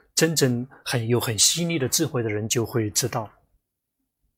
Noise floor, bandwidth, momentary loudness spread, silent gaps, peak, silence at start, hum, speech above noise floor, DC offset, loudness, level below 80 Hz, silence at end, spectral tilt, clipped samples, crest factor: -79 dBFS; 16.5 kHz; 10 LU; none; -4 dBFS; 0.15 s; none; 56 dB; under 0.1%; -23 LUFS; -60 dBFS; 1.1 s; -3.5 dB/octave; under 0.1%; 20 dB